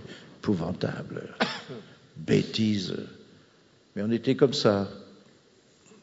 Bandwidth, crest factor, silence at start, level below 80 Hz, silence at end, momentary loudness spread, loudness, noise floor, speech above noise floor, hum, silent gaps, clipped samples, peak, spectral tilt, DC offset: 8 kHz; 22 dB; 0 s; -64 dBFS; 0.9 s; 20 LU; -28 LUFS; -60 dBFS; 33 dB; none; none; under 0.1%; -6 dBFS; -6 dB/octave; under 0.1%